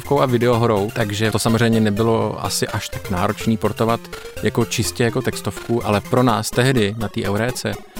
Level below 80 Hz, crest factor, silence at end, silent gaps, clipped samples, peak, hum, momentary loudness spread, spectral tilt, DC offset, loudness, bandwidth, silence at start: -42 dBFS; 16 dB; 0 s; none; under 0.1%; -2 dBFS; none; 8 LU; -5.5 dB/octave; under 0.1%; -19 LUFS; 17.5 kHz; 0 s